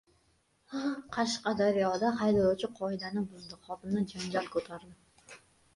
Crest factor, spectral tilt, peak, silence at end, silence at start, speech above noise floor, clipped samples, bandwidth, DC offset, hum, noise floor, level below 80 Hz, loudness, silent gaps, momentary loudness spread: 16 dB; -5.5 dB/octave; -16 dBFS; 0.4 s; 0.7 s; 39 dB; under 0.1%; 11.5 kHz; under 0.1%; none; -71 dBFS; -64 dBFS; -32 LUFS; none; 15 LU